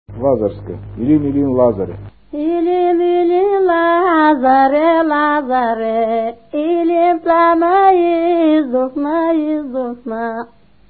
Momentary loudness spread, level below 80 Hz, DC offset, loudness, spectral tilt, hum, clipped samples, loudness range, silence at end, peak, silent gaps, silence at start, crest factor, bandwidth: 11 LU; -46 dBFS; 0.4%; -14 LUFS; -12 dB/octave; none; under 0.1%; 3 LU; 0.45 s; 0 dBFS; none; 0.1 s; 14 dB; 4.6 kHz